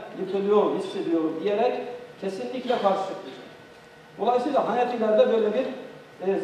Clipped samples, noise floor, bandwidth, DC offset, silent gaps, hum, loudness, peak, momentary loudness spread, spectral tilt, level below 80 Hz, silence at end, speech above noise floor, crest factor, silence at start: under 0.1%; -48 dBFS; 10.5 kHz; under 0.1%; none; none; -25 LUFS; -8 dBFS; 16 LU; -6.5 dB/octave; -74 dBFS; 0 s; 24 dB; 18 dB; 0 s